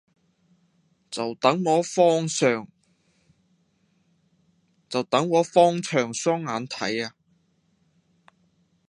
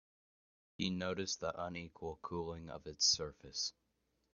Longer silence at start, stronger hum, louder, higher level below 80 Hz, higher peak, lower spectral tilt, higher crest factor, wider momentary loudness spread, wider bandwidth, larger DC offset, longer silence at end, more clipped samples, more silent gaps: first, 1.1 s vs 0.8 s; neither; first, -23 LUFS vs -39 LUFS; second, -74 dBFS vs -68 dBFS; first, -2 dBFS vs -20 dBFS; first, -4.5 dB/octave vs -3 dB/octave; about the same, 24 dB vs 22 dB; second, 11 LU vs 15 LU; first, 11 kHz vs 7.2 kHz; neither; first, 1.8 s vs 0.65 s; neither; neither